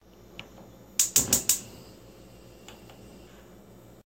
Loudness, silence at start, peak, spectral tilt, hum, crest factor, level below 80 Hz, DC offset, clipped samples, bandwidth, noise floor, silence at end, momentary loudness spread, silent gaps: -24 LUFS; 0.35 s; -4 dBFS; -1 dB/octave; 60 Hz at -60 dBFS; 28 dB; -56 dBFS; under 0.1%; under 0.1%; 16.5 kHz; -51 dBFS; 0.85 s; 27 LU; none